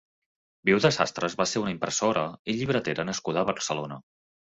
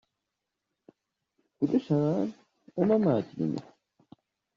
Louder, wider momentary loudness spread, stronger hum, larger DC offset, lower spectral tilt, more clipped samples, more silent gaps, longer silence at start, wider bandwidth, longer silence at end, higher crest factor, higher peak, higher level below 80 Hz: about the same, -27 LUFS vs -28 LUFS; second, 8 LU vs 11 LU; neither; neither; second, -4 dB/octave vs -9 dB/octave; neither; first, 2.39-2.45 s vs none; second, 0.65 s vs 1.6 s; first, 8.4 kHz vs 7.4 kHz; second, 0.5 s vs 0.95 s; about the same, 22 dB vs 20 dB; first, -6 dBFS vs -12 dBFS; first, -62 dBFS vs -70 dBFS